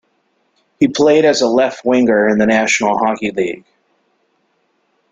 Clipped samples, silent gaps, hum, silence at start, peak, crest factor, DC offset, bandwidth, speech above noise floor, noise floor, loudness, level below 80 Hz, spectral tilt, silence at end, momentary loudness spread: under 0.1%; none; none; 0.8 s; -2 dBFS; 14 dB; under 0.1%; 9.4 kHz; 50 dB; -63 dBFS; -14 LUFS; -56 dBFS; -4 dB/octave; 1.55 s; 8 LU